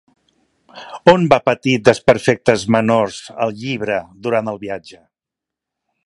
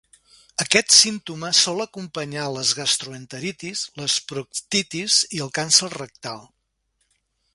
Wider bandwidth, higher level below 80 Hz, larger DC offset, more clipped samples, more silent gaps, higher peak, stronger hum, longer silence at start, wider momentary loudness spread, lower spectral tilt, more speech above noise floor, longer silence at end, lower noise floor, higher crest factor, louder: about the same, 11.5 kHz vs 12 kHz; first, -52 dBFS vs -64 dBFS; neither; neither; neither; about the same, 0 dBFS vs 0 dBFS; neither; first, 0.75 s vs 0.6 s; second, 12 LU vs 18 LU; first, -5.5 dB/octave vs -1 dB/octave; first, 70 dB vs 49 dB; about the same, 1.15 s vs 1.1 s; first, -85 dBFS vs -72 dBFS; second, 18 dB vs 24 dB; first, -16 LUFS vs -20 LUFS